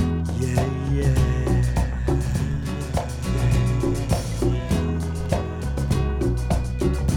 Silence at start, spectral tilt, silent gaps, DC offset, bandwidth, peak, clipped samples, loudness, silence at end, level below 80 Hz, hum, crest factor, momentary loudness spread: 0 s; -7 dB/octave; none; under 0.1%; 16.5 kHz; -6 dBFS; under 0.1%; -24 LUFS; 0 s; -28 dBFS; none; 14 dB; 5 LU